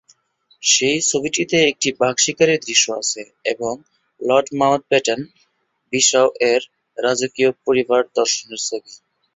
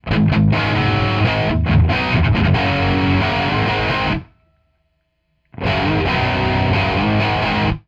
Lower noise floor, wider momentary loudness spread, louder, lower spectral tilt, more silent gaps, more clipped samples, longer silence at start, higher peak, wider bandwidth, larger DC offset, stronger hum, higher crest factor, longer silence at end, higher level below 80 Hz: about the same, -66 dBFS vs -67 dBFS; first, 11 LU vs 3 LU; about the same, -18 LUFS vs -17 LUFS; second, -2 dB/octave vs -7.5 dB/octave; neither; neither; first, 0.6 s vs 0.05 s; about the same, -2 dBFS vs -4 dBFS; first, 8.4 kHz vs 7.6 kHz; neither; neither; about the same, 18 dB vs 14 dB; first, 0.4 s vs 0.1 s; second, -62 dBFS vs -28 dBFS